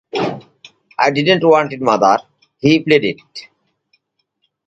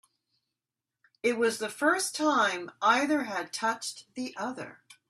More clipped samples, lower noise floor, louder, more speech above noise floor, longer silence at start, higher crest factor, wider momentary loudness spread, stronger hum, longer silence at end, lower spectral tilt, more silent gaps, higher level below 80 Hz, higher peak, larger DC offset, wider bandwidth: neither; second, -68 dBFS vs -89 dBFS; first, -15 LUFS vs -29 LUFS; second, 54 dB vs 60 dB; second, 0.15 s vs 1.25 s; about the same, 16 dB vs 20 dB; first, 19 LU vs 13 LU; neither; first, 1.25 s vs 0.15 s; first, -5.5 dB/octave vs -2 dB/octave; neither; first, -58 dBFS vs -80 dBFS; first, 0 dBFS vs -10 dBFS; neither; second, 8 kHz vs 14 kHz